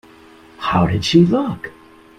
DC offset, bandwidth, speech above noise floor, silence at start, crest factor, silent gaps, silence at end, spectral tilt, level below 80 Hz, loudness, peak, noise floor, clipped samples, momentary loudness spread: under 0.1%; 10 kHz; 29 dB; 0.6 s; 18 dB; none; 0.5 s; -6.5 dB/octave; -44 dBFS; -16 LUFS; 0 dBFS; -45 dBFS; under 0.1%; 16 LU